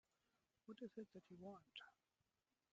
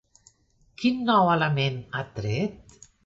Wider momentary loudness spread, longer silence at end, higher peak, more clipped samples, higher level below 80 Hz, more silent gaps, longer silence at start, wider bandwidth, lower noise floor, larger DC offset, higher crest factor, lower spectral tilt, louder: second, 6 LU vs 12 LU; first, 0.8 s vs 0.5 s; second, -42 dBFS vs -8 dBFS; neither; second, under -90 dBFS vs -58 dBFS; neither; second, 0.65 s vs 0.8 s; about the same, 7.4 kHz vs 7.8 kHz; first, under -90 dBFS vs -63 dBFS; neither; about the same, 20 dB vs 18 dB; second, -4 dB/octave vs -6.5 dB/octave; second, -60 LUFS vs -25 LUFS